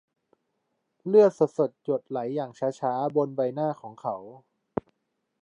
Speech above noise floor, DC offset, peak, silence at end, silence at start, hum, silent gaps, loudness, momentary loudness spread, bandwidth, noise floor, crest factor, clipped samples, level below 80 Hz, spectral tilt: 53 dB; under 0.1%; -8 dBFS; 1.05 s; 1.05 s; none; none; -27 LUFS; 16 LU; 8.2 kHz; -79 dBFS; 20 dB; under 0.1%; -70 dBFS; -8 dB/octave